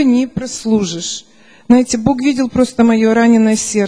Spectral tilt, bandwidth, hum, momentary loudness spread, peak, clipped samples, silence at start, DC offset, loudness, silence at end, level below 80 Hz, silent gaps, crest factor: -4.5 dB/octave; 10.5 kHz; none; 11 LU; 0 dBFS; under 0.1%; 0 s; 0.3%; -13 LUFS; 0 s; -44 dBFS; none; 12 dB